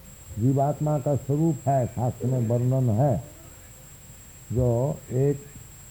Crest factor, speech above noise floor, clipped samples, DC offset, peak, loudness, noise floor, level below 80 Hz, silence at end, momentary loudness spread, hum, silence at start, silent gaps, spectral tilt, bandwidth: 14 dB; 23 dB; under 0.1%; under 0.1%; -12 dBFS; -25 LUFS; -46 dBFS; -48 dBFS; 0 s; 22 LU; none; 0.05 s; none; -8.5 dB/octave; 19.5 kHz